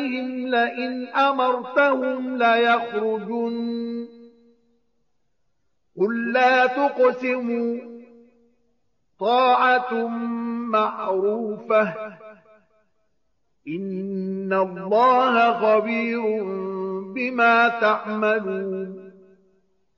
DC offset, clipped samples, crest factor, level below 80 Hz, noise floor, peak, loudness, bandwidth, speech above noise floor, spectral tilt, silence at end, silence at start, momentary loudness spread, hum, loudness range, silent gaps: under 0.1%; under 0.1%; 16 dB; -76 dBFS; -75 dBFS; -8 dBFS; -21 LUFS; 7 kHz; 54 dB; -3 dB/octave; 0.85 s; 0 s; 12 LU; none; 6 LU; none